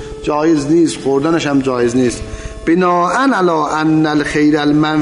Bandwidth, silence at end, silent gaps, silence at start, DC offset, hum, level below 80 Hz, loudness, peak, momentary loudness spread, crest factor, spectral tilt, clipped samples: 11 kHz; 0 s; none; 0 s; under 0.1%; none; -36 dBFS; -14 LUFS; -4 dBFS; 5 LU; 10 dB; -5.5 dB/octave; under 0.1%